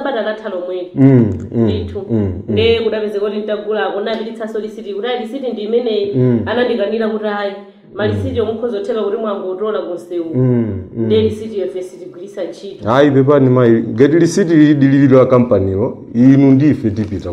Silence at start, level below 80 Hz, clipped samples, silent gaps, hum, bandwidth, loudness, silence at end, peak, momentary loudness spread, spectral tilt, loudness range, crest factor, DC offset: 0 s; -50 dBFS; under 0.1%; none; none; 10.5 kHz; -14 LUFS; 0 s; 0 dBFS; 13 LU; -7.5 dB/octave; 8 LU; 14 dB; under 0.1%